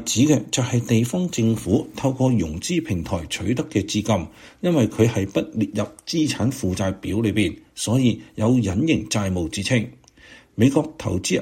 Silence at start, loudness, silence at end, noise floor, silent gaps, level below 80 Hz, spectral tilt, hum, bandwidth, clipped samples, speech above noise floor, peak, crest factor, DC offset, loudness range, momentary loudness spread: 0 s; -22 LUFS; 0 s; -48 dBFS; none; -46 dBFS; -5.5 dB/octave; none; 16.5 kHz; under 0.1%; 27 dB; -4 dBFS; 18 dB; under 0.1%; 1 LU; 6 LU